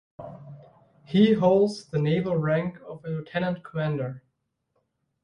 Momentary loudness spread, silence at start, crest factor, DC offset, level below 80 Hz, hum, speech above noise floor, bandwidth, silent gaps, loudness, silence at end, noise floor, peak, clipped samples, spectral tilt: 22 LU; 0.2 s; 20 dB; under 0.1%; -62 dBFS; none; 52 dB; 10.5 kHz; none; -25 LUFS; 1.05 s; -76 dBFS; -8 dBFS; under 0.1%; -8 dB/octave